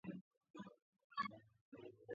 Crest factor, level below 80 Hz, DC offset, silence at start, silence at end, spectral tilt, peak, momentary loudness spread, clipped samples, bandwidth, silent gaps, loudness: 24 dB; -88 dBFS; under 0.1%; 0.05 s; 0 s; -4 dB/octave; -30 dBFS; 16 LU; under 0.1%; 7 kHz; 0.21-0.31 s, 0.37-0.41 s, 0.50-0.54 s, 0.82-0.93 s, 1.04-1.10 s, 1.61-1.72 s; -52 LUFS